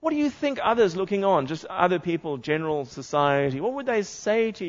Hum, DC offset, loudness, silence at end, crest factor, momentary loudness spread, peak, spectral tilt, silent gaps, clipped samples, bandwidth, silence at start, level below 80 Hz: none; under 0.1%; -25 LUFS; 0 s; 18 dB; 7 LU; -6 dBFS; -5.5 dB/octave; none; under 0.1%; 7.8 kHz; 0 s; -62 dBFS